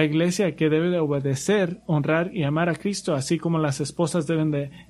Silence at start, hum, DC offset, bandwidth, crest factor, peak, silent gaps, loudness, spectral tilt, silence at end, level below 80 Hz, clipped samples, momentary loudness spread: 0 s; none; under 0.1%; 13.5 kHz; 18 dB; -6 dBFS; none; -24 LUFS; -6 dB/octave; 0.05 s; -58 dBFS; under 0.1%; 4 LU